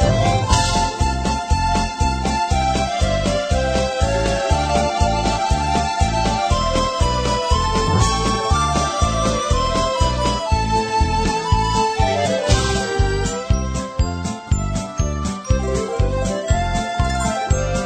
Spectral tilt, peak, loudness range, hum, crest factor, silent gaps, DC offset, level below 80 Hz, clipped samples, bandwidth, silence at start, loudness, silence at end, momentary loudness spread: -4.5 dB/octave; -2 dBFS; 3 LU; none; 16 dB; none; under 0.1%; -24 dBFS; under 0.1%; 14.5 kHz; 0 s; -19 LUFS; 0 s; 4 LU